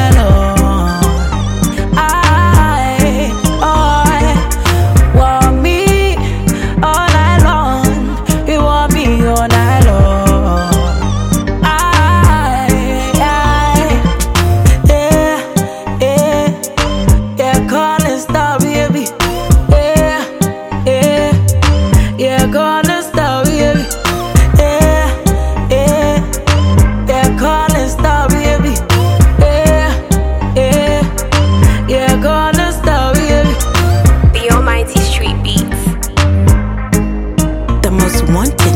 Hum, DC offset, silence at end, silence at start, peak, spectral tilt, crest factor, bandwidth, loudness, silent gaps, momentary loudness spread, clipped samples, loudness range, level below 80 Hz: none; under 0.1%; 0 s; 0 s; 0 dBFS; -5.5 dB/octave; 10 dB; 17 kHz; -11 LUFS; none; 6 LU; under 0.1%; 2 LU; -16 dBFS